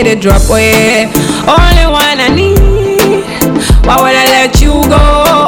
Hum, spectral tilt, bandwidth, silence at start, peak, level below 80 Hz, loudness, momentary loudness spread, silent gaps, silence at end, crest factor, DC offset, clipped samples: none; -4.5 dB/octave; over 20 kHz; 0 s; 0 dBFS; -12 dBFS; -7 LUFS; 4 LU; none; 0 s; 6 dB; 0.4%; 7%